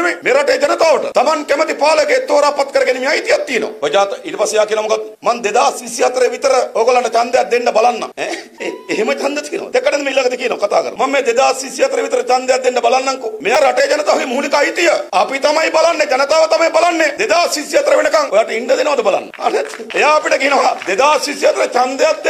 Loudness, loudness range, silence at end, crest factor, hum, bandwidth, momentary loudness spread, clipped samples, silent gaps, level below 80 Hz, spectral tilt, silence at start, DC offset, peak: -14 LUFS; 3 LU; 0 s; 14 dB; none; 15 kHz; 6 LU; under 0.1%; none; -62 dBFS; -1.5 dB/octave; 0 s; under 0.1%; 0 dBFS